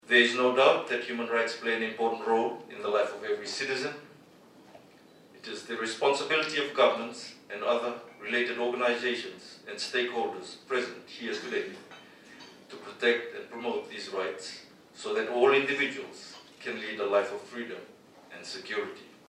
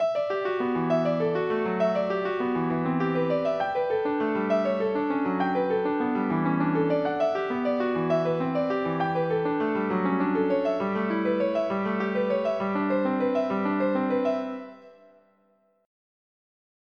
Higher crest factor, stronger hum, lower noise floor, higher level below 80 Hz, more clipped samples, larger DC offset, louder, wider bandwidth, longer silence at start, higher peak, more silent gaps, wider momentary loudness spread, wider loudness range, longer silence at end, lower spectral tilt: first, 24 dB vs 14 dB; neither; second, -56 dBFS vs -66 dBFS; second, -84 dBFS vs -68 dBFS; neither; neither; second, -29 LUFS vs -26 LUFS; first, 12.5 kHz vs 6.4 kHz; about the same, 0.05 s vs 0 s; first, -8 dBFS vs -12 dBFS; neither; first, 21 LU vs 2 LU; first, 6 LU vs 2 LU; second, 0.15 s vs 1.9 s; second, -3 dB/octave vs -8.5 dB/octave